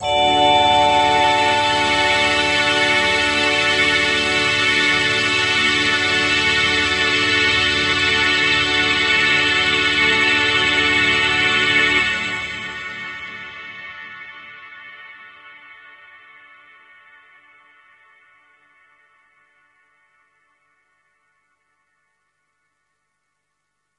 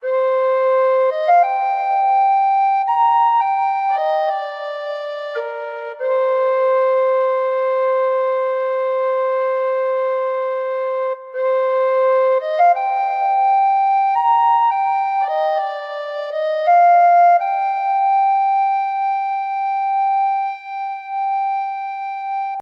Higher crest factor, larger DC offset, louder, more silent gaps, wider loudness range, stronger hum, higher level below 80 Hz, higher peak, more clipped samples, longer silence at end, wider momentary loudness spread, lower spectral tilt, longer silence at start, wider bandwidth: about the same, 16 dB vs 12 dB; neither; about the same, -15 LUFS vs -17 LUFS; neither; first, 16 LU vs 4 LU; first, 50 Hz at -55 dBFS vs none; first, -48 dBFS vs under -90 dBFS; about the same, -4 dBFS vs -6 dBFS; neither; first, 8.25 s vs 0 s; first, 18 LU vs 11 LU; first, -2 dB/octave vs -0.5 dB/octave; about the same, 0 s vs 0 s; first, 11.5 kHz vs 5.8 kHz